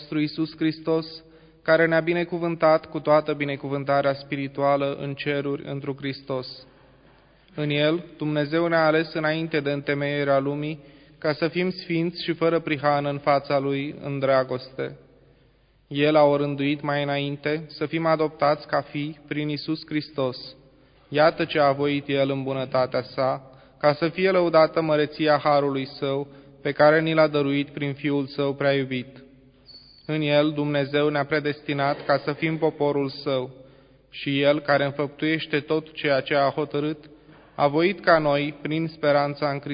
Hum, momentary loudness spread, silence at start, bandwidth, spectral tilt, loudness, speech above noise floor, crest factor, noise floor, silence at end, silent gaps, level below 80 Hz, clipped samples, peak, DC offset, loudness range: none; 11 LU; 0 s; 5.2 kHz; -10.5 dB/octave; -24 LUFS; 36 dB; 20 dB; -59 dBFS; 0 s; none; -62 dBFS; under 0.1%; -4 dBFS; under 0.1%; 4 LU